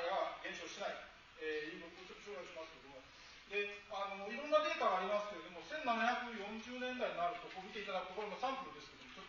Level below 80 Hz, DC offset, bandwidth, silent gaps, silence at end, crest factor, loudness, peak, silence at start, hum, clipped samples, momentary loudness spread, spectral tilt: -74 dBFS; under 0.1%; 7.2 kHz; none; 0 s; 22 dB; -42 LUFS; -20 dBFS; 0 s; none; under 0.1%; 17 LU; -1 dB/octave